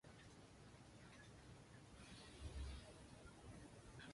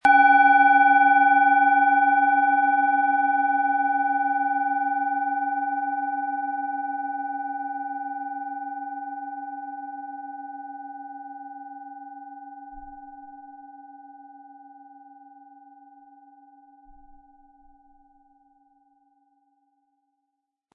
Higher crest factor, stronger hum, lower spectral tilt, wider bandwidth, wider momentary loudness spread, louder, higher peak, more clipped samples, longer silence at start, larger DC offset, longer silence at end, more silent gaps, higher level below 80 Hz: about the same, 18 dB vs 18 dB; neither; about the same, -4.5 dB/octave vs -3.5 dB/octave; first, 11.5 kHz vs 4.7 kHz; second, 9 LU vs 25 LU; second, -60 LUFS vs -21 LUFS; second, -42 dBFS vs -6 dBFS; neither; about the same, 0.05 s vs 0.05 s; neither; second, 0 s vs 6.35 s; neither; first, -62 dBFS vs -68 dBFS